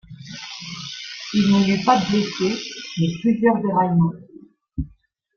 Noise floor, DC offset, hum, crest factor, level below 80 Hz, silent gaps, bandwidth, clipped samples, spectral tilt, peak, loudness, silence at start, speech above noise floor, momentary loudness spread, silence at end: -54 dBFS; under 0.1%; none; 18 dB; -46 dBFS; none; 7.2 kHz; under 0.1%; -6 dB/octave; -4 dBFS; -20 LUFS; 0.1 s; 36 dB; 17 LU; 0.5 s